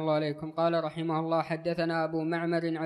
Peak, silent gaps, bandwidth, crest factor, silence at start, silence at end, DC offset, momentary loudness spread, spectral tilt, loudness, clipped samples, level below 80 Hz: -16 dBFS; none; 10.5 kHz; 14 dB; 0 s; 0 s; under 0.1%; 3 LU; -8 dB/octave; -30 LUFS; under 0.1%; -70 dBFS